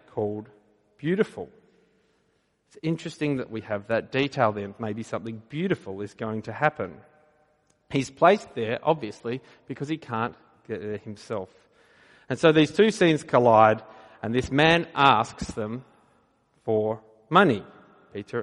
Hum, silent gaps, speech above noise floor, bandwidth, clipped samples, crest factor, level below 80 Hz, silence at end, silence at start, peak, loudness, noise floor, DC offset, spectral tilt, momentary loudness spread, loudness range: none; none; 45 dB; 11.5 kHz; under 0.1%; 22 dB; -58 dBFS; 0 s; 0.15 s; -4 dBFS; -25 LUFS; -69 dBFS; under 0.1%; -6 dB/octave; 17 LU; 10 LU